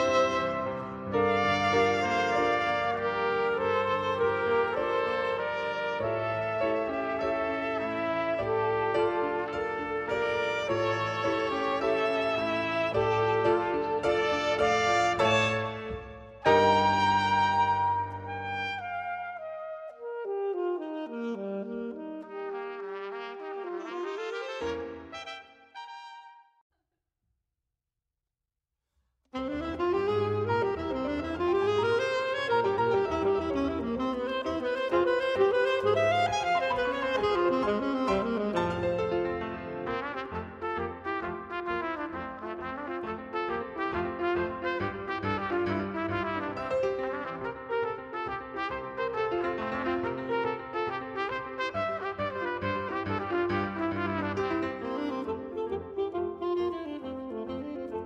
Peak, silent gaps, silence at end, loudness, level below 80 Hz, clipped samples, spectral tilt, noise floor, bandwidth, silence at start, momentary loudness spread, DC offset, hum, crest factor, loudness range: -10 dBFS; 26.61-26.70 s; 0 s; -30 LUFS; -56 dBFS; under 0.1%; -5.5 dB/octave; -88 dBFS; 10 kHz; 0 s; 12 LU; under 0.1%; none; 20 dB; 10 LU